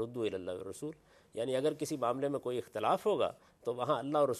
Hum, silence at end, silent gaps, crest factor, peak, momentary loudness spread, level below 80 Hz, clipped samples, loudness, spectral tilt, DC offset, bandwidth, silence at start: none; 0 s; none; 18 dB; -18 dBFS; 12 LU; -74 dBFS; under 0.1%; -35 LUFS; -5.5 dB/octave; under 0.1%; 14.5 kHz; 0 s